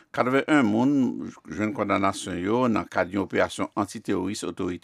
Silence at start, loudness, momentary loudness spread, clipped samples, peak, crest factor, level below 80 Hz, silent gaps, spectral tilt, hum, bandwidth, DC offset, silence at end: 0.15 s; -25 LUFS; 9 LU; under 0.1%; -6 dBFS; 20 dB; -62 dBFS; none; -5.5 dB/octave; none; 13.5 kHz; under 0.1%; 0.05 s